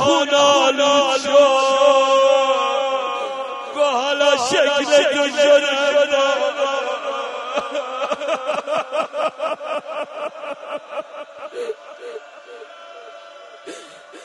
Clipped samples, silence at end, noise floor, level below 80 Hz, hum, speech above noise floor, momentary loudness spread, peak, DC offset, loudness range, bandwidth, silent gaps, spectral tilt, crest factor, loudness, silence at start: under 0.1%; 0 s; -40 dBFS; -68 dBFS; none; 24 dB; 22 LU; -2 dBFS; under 0.1%; 16 LU; 11.5 kHz; none; -1.5 dB/octave; 18 dB; -17 LUFS; 0 s